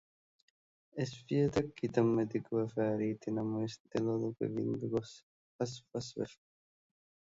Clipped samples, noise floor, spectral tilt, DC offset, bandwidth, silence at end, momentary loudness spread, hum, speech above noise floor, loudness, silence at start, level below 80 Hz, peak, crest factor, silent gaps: under 0.1%; under -90 dBFS; -7 dB/octave; under 0.1%; 7.8 kHz; 0.95 s; 11 LU; none; over 55 dB; -36 LUFS; 0.95 s; -68 dBFS; -16 dBFS; 22 dB; 3.80-3.85 s, 5.23-5.59 s